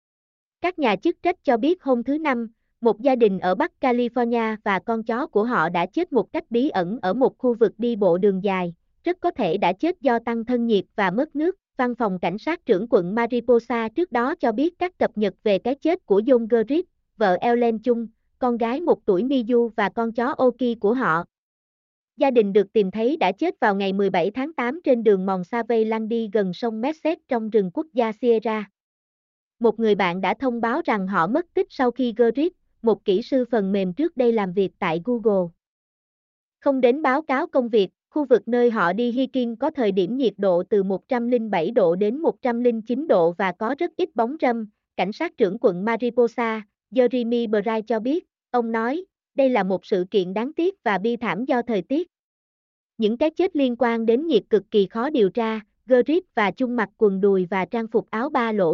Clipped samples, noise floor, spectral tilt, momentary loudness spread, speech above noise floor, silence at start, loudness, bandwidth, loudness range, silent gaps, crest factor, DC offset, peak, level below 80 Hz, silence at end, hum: under 0.1%; under -90 dBFS; -7.5 dB/octave; 6 LU; over 69 dB; 0.6 s; -22 LUFS; 6.8 kHz; 2 LU; 21.38-22.08 s, 28.80-29.51 s, 35.67-36.52 s, 52.19-52.90 s; 16 dB; under 0.1%; -6 dBFS; -62 dBFS; 0 s; none